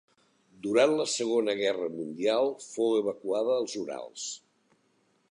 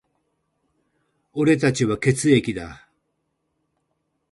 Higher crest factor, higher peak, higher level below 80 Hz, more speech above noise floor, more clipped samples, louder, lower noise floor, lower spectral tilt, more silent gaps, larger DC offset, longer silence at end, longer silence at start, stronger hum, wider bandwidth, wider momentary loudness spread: about the same, 20 dB vs 20 dB; second, -10 dBFS vs -4 dBFS; second, -80 dBFS vs -54 dBFS; second, 42 dB vs 54 dB; neither; second, -29 LUFS vs -20 LUFS; second, -70 dBFS vs -74 dBFS; second, -3 dB/octave vs -5.5 dB/octave; neither; neither; second, 0.95 s vs 1.55 s; second, 0.65 s vs 1.35 s; neither; about the same, 11 kHz vs 11.5 kHz; about the same, 13 LU vs 15 LU